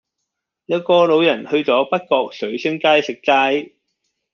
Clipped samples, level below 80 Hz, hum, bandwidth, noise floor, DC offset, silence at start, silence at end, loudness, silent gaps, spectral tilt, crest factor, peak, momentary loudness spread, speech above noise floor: under 0.1%; -68 dBFS; none; 7 kHz; -78 dBFS; under 0.1%; 0.7 s; 0.65 s; -17 LUFS; none; -5 dB/octave; 16 dB; -2 dBFS; 9 LU; 62 dB